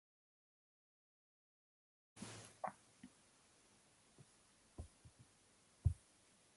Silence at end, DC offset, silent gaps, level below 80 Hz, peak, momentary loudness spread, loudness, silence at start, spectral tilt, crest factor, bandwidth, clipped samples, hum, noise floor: 0.6 s; under 0.1%; none; -58 dBFS; -24 dBFS; 26 LU; -49 LUFS; 2.15 s; -5.5 dB/octave; 30 dB; 11.5 kHz; under 0.1%; none; -72 dBFS